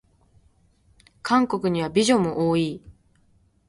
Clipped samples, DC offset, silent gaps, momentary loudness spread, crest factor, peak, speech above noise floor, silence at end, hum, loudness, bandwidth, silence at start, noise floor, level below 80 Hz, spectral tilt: under 0.1%; under 0.1%; none; 11 LU; 18 dB; -6 dBFS; 40 dB; 0.75 s; none; -22 LUFS; 11.5 kHz; 1.25 s; -61 dBFS; -56 dBFS; -5.5 dB/octave